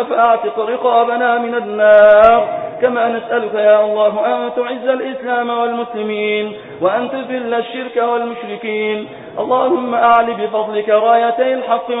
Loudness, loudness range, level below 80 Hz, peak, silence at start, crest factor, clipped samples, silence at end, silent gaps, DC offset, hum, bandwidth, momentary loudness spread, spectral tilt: -14 LUFS; 7 LU; -54 dBFS; 0 dBFS; 0 s; 14 dB; under 0.1%; 0 s; none; under 0.1%; none; 4 kHz; 11 LU; -7.5 dB/octave